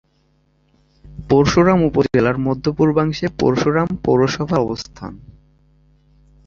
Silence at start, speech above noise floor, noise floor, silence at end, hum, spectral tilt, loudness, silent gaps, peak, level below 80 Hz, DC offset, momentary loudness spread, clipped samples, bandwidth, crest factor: 1.05 s; 44 dB; -60 dBFS; 1.3 s; none; -7 dB/octave; -17 LUFS; none; -2 dBFS; -42 dBFS; under 0.1%; 14 LU; under 0.1%; 7.6 kHz; 16 dB